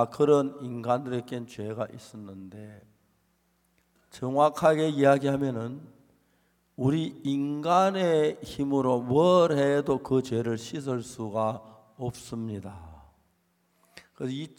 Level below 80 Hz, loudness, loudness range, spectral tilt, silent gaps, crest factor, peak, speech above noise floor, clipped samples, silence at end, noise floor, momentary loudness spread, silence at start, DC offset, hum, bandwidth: -64 dBFS; -27 LUFS; 11 LU; -6.5 dB/octave; none; 20 dB; -8 dBFS; 44 dB; under 0.1%; 0.1 s; -70 dBFS; 17 LU; 0 s; under 0.1%; none; 16 kHz